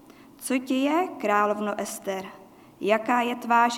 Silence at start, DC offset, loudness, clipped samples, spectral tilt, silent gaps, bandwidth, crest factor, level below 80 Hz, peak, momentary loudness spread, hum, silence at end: 0.4 s; under 0.1%; -26 LUFS; under 0.1%; -4 dB/octave; none; 18 kHz; 18 dB; -74 dBFS; -8 dBFS; 10 LU; none; 0 s